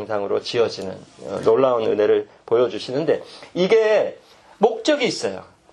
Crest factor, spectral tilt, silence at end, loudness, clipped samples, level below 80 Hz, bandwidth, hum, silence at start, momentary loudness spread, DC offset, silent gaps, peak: 18 dB; -5 dB/octave; 0.3 s; -20 LUFS; under 0.1%; -66 dBFS; 10.5 kHz; none; 0 s; 14 LU; under 0.1%; none; -2 dBFS